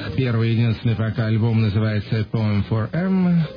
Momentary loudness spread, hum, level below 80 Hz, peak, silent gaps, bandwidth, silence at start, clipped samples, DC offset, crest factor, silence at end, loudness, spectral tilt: 3 LU; none; -46 dBFS; -8 dBFS; none; 5.2 kHz; 0 s; under 0.1%; under 0.1%; 12 dB; 0 s; -21 LUFS; -10 dB/octave